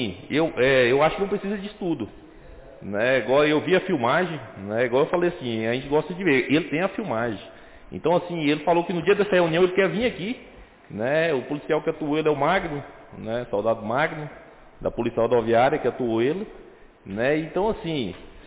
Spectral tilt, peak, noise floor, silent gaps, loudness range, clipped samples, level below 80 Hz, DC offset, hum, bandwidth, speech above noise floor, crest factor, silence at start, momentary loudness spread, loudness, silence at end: -10 dB/octave; -10 dBFS; -44 dBFS; none; 3 LU; under 0.1%; -52 dBFS; under 0.1%; none; 4 kHz; 21 dB; 14 dB; 0 s; 12 LU; -23 LUFS; 0 s